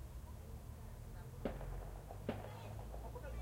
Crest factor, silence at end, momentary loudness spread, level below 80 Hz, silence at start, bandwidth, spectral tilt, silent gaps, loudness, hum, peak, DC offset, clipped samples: 20 dB; 0 s; 6 LU; -52 dBFS; 0 s; 16 kHz; -6.5 dB/octave; none; -50 LUFS; none; -28 dBFS; under 0.1%; under 0.1%